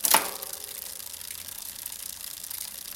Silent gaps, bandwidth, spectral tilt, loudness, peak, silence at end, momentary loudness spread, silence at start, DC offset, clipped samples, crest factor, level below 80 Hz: none; 17 kHz; 0.5 dB/octave; -31 LUFS; -2 dBFS; 0 s; 11 LU; 0 s; under 0.1%; under 0.1%; 30 dB; -64 dBFS